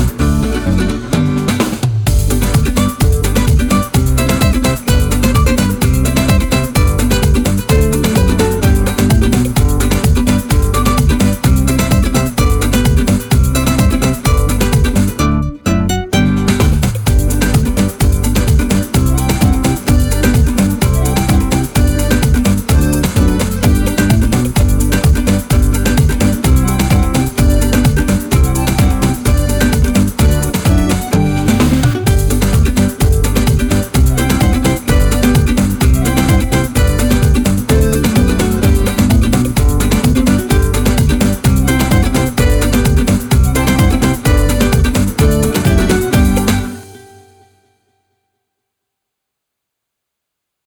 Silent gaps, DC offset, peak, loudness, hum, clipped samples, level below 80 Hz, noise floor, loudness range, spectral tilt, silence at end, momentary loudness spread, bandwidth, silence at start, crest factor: none; under 0.1%; 0 dBFS; -12 LUFS; none; under 0.1%; -16 dBFS; -77 dBFS; 1 LU; -5.5 dB/octave; 3.7 s; 2 LU; 19.5 kHz; 0 s; 12 dB